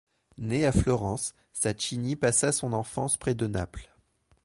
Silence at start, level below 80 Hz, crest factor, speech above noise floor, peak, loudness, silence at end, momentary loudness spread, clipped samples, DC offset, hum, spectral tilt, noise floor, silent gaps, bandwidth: 0.4 s; -44 dBFS; 20 dB; 38 dB; -10 dBFS; -28 LUFS; 0.6 s; 10 LU; under 0.1%; under 0.1%; none; -4.5 dB/octave; -66 dBFS; none; 11.5 kHz